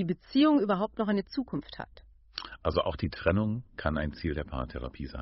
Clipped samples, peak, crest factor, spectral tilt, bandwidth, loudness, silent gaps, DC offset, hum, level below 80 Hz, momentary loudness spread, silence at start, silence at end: under 0.1%; -10 dBFS; 20 dB; -5.5 dB/octave; 5.8 kHz; -30 LUFS; none; under 0.1%; none; -44 dBFS; 17 LU; 0 s; 0 s